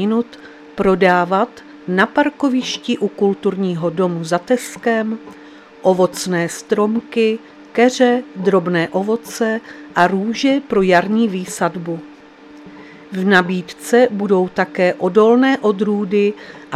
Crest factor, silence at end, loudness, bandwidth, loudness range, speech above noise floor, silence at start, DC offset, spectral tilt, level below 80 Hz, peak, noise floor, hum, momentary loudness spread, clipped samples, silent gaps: 16 dB; 0 s; -17 LUFS; 14.5 kHz; 3 LU; 24 dB; 0 s; under 0.1%; -5.5 dB/octave; -56 dBFS; 0 dBFS; -41 dBFS; none; 10 LU; under 0.1%; none